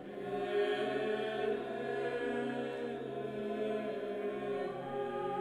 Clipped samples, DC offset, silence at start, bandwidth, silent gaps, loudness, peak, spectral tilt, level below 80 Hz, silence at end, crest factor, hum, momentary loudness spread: under 0.1%; under 0.1%; 0 s; 11 kHz; none; -37 LUFS; -24 dBFS; -6 dB/octave; -72 dBFS; 0 s; 14 dB; none; 6 LU